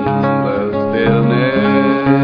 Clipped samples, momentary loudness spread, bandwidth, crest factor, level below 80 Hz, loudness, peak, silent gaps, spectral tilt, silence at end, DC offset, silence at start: under 0.1%; 4 LU; 5.4 kHz; 12 dB; -44 dBFS; -14 LUFS; 0 dBFS; none; -10 dB/octave; 0 s; under 0.1%; 0 s